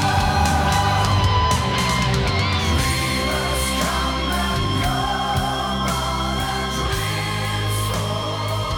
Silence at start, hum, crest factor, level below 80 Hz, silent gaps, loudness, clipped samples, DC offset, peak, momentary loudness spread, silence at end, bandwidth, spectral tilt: 0 s; none; 12 dB; -30 dBFS; none; -20 LUFS; under 0.1%; under 0.1%; -8 dBFS; 5 LU; 0 s; 19 kHz; -4 dB/octave